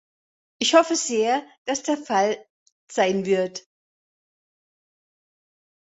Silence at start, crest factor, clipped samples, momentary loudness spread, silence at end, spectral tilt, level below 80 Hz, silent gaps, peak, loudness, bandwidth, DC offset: 0.6 s; 22 dB; under 0.1%; 12 LU; 2.25 s; -3 dB/octave; -72 dBFS; 1.58-1.65 s, 2.50-2.66 s, 2.72-2.87 s; -4 dBFS; -22 LUFS; 8.4 kHz; under 0.1%